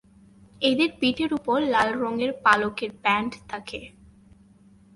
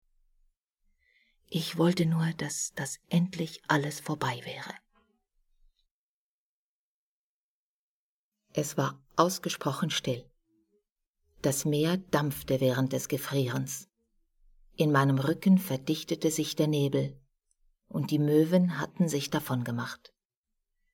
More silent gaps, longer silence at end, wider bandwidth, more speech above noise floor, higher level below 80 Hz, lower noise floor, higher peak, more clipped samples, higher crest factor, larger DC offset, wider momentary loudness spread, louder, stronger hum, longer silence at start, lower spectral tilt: second, none vs 5.91-8.32 s, 10.91-10.96 s, 11.07-11.14 s; about the same, 1.1 s vs 1 s; second, 11.5 kHz vs 18 kHz; second, 30 dB vs over 61 dB; first, -58 dBFS vs -66 dBFS; second, -54 dBFS vs under -90 dBFS; first, -4 dBFS vs -8 dBFS; neither; about the same, 20 dB vs 24 dB; neither; about the same, 14 LU vs 12 LU; first, -24 LUFS vs -29 LUFS; neither; second, 0.6 s vs 1.5 s; about the same, -4.5 dB/octave vs -5.5 dB/octave